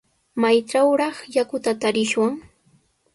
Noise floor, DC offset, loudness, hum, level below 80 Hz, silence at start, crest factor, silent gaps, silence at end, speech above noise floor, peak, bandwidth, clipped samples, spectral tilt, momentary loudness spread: -61 dBFS; under 0.1%; -21 LUFS; none; -64 dBFS; 0.35 s; 16 dB; none; 0.75 s; 41 dB; -6 dBFS; 11.5 kHz; under 0.1%; -4 dB/octave; 6 LU